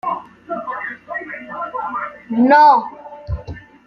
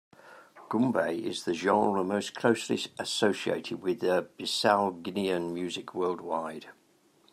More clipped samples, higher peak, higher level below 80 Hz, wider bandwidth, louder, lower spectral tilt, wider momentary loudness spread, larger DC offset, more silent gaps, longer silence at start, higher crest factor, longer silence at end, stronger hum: neither; first, -2 dBFS vs -10 dBFS; first, -40 dBFS vs -76 dBFS; second, 6.4 kHz vs 14.5 kHz; first, -17 LUFS vs -29 LUFS; first, -7.5 dB/octave vs -4.5 dB/octave; first, 19 LU vs 8 LU; neither; neither; second, 0.05 s vs 0.25 s; about the same, 16 dB vs 20 dB; second, 0.25 s vs 0.6 s; neither